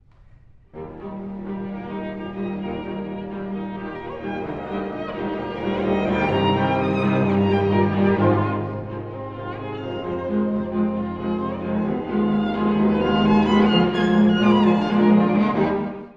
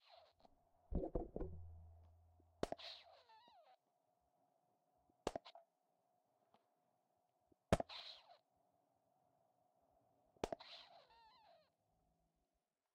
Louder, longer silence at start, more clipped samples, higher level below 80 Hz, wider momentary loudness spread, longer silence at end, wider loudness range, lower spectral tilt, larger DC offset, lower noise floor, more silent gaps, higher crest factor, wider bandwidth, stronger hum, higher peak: first, -22 LUFS vs -49 LUFS; first, 0.75 s vs 0.1 s; neither; first, -46 dBFS vs -62 dBFS; second, 14 LU vs 26 LU; second, 0.05 s vs 1.4 s; first, 12 LU vs 8 LU; first, -8.5 dB/octave vs -5.5 dB/octave; neither; second, -49 dBFS vs under -90 dBFS; neither; second, 16 dB vs 32 dB; second, 6.8 kHz vs 9 kHz; neither; first, -4 dBFS vs -20 dBFS